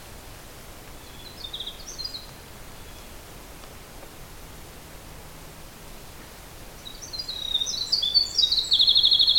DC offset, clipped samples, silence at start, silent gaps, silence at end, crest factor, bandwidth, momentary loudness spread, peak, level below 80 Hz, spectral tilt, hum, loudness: under 0.1%; under 0.1%; 0 s; none; 0 s; 22 dB; 17 kHz; 25 LU; -6 dBFS; -48 dBFS; -1 dB/octave; none; -21 LUFS